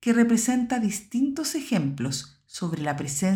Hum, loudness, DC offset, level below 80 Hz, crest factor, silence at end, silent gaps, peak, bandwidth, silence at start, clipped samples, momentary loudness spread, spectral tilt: none; -26 LUFS; under 0.1%; -60 dBFS; 18 dB; 0 s; none; -8 dBFS; 17 kHz; 0 s; under 0.1%; 11 LU; -4.5 dB/octave